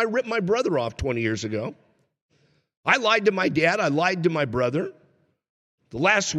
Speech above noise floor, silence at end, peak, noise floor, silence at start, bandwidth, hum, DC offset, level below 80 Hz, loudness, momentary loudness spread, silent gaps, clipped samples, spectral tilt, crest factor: 40 dB; 0 s; -4 dBFS; -63 dBFS; 0 s; 11.5 kHz; none; under 0.1%; -50 dBFS; -23 LUFS; 10 LU; 2.22-2.29 s, 2.77-2.83 s, 5.49-5.78 s; under 0.1%; -4.5 dB/octave; 20 dB